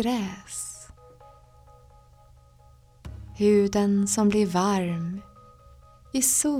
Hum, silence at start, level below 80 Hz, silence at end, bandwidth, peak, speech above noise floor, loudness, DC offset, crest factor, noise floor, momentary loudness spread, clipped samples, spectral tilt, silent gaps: none; 0 s; -52 dBFS; 0 s; 16.5 kHz; -8 dBFS; 31 dB; -24 LUFS; under 0.1%; 20 dB; -54 dBFS; 22 LU; under 0.1%; -4.5 dB/octave; none